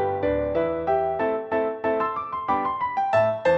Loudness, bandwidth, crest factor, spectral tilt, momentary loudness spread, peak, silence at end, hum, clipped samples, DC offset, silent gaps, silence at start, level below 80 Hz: -24 LUFS; 7.8 kHz; 14 dB; -7.5 dB/octave; 4 LU; -8 dBFS; 0 s; none; under 0.1%; under 0.1%; none; 0 s; -48 dBFS